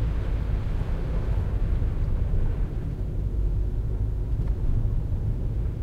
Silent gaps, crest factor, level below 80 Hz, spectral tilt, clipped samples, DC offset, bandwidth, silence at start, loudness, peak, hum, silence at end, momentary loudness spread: none; 12 dB; -26 dBFS; -9.5 dB/octave; under 0.1%; under 0.1%; 4.8 kHz; 0 s; -29 LUFS; -14 dBFS; none; 0 s; 2 LU